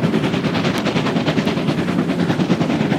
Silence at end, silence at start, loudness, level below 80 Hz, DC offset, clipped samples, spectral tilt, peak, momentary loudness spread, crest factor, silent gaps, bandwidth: 0 s; 0 s; -18 LUFS; -48 dBFS; under 0.1%; under 0.1%; -6.5 dB/octave; -4 dBFS; 1 LU; 14 dB; none; 15.5 kHz